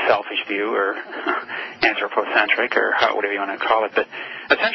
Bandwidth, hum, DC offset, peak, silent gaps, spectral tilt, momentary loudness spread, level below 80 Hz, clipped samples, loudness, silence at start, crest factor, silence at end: 6 kHz; none; under 0.1%; 0 dBFS; none; -4 dB/octave; 8 LU; -62 dBFS; under 0.1%; -20 LUFS; 0 s; 20 dB; 0 s